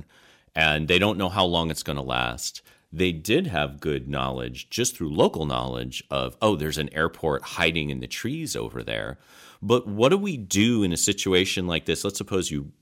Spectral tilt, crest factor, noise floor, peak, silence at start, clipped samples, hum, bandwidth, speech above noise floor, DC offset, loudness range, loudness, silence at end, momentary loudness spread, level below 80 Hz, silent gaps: -4 dB/octave; 20 dB; -57 dBFS; -6 dBFS; 0.55 s; under 0.1%; none; 16.5 kHz; 32 dB; under 0.1%; 4 LU; -25 LUFS; 0.1 s; 10 LU; -46 dBFS; none